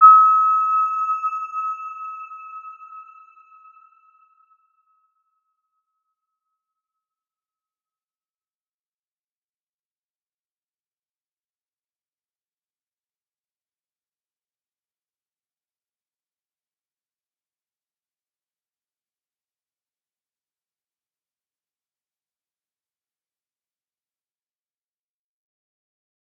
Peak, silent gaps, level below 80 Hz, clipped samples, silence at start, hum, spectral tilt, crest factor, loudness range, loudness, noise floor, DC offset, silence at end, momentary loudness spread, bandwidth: -2 dBFS; none; under -90 dBFS; under 0.1%; 0 s; none; 1 dB/octave; 26 dB; 25 LU; -17 LUFS; under -90 dBFS; under 0.1%; 23.2 s; 26 LU; 7 kHz